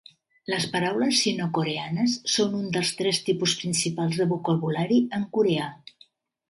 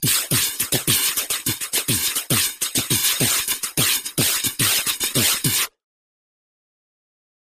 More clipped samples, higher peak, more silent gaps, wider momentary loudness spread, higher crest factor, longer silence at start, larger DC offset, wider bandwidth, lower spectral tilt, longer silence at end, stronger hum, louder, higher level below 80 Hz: neither; second, -10 dBFS vs -6 dBFS; neither; about the same, 5 LU vs 4 LU; about the same, 16 dB vs 18 dB; first, 0.5 s vs 0 s; neither; second, 11.5 kHz vs 15.5 kHz; first, -4 dB/octave vs -1.5 dB/octave; second, 0.75 s vs 1.8 s; neither; second, -25 LUFS vs -19 LUFS; second, -68 dBFS vs -52 dBFS